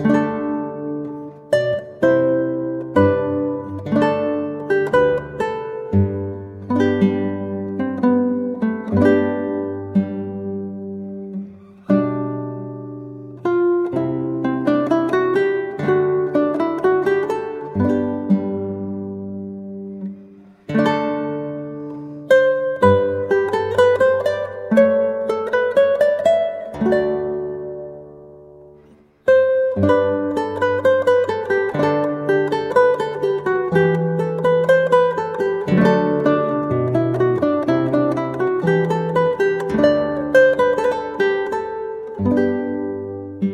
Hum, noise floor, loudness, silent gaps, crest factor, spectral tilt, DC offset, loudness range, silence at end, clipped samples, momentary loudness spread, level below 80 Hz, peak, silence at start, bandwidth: none; -49 dBFS; -19 LUFS; none; 16 dB; -8 dB/octave; under 0.1%; 6 LU; 0 s; under 0.1%; 14 LU; -54 dBFS; -2 dBFS; 0 s; 10.5 kHz